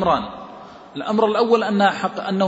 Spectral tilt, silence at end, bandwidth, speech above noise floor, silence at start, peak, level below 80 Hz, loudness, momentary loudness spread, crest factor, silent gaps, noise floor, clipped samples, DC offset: -6 dB/octave; 0 s; 8 kHz; 21 dB; 0 s; -4 dBFS; -52 dBFS; -19 LUFS; 20 LU; 16 dB; none; -39 dBFS; under 0.1%; under 0.1%